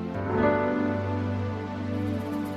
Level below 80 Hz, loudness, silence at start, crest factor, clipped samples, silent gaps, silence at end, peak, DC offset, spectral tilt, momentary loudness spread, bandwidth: -54 dBFS; -28 LUFS; 0 s; 16 dB; under 0.1%; none; 0 s; -12 dBFS; under 0.1%; -8.5 dB/octave; 8 LU; 14.5 kHz